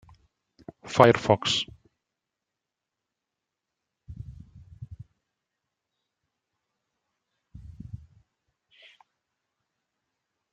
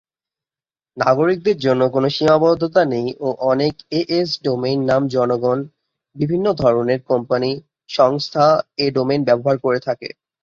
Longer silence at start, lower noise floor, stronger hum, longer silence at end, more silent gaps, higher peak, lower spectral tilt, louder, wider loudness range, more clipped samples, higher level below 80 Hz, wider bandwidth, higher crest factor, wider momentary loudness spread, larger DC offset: about the same, 0.85 s vs 0.95 s; second, -86 dBFS vs under -90 dBFS; neither; first, 2.55 s vs 0.35 s; neither; about the same, -2 dBFS vs -2 dBFS; second, -5 dB/octave vs -7 dB/octave; second, -22 LUFS vs -18 LUFS; first, 26 LU vs 2 LU; neither; about the same, -58 dBFS vs -54 dBFS; first, 13 kHz vs 7.4 kHz; first, 30 dB vs 16 dB; first, 27 LU vs 8 LU; neither